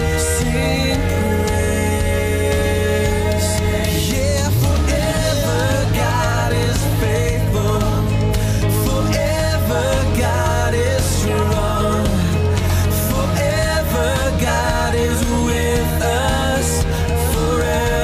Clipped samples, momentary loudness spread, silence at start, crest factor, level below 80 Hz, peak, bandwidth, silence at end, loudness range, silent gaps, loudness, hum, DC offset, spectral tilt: under 0.1%; 1 LU; 0 s; 10 dB; -24 dBFS; -6 dBFS; 15.5 kHz; 0 s; 0 LU; none; -17 LUFS; none; under 0.1%; -5 dB/octave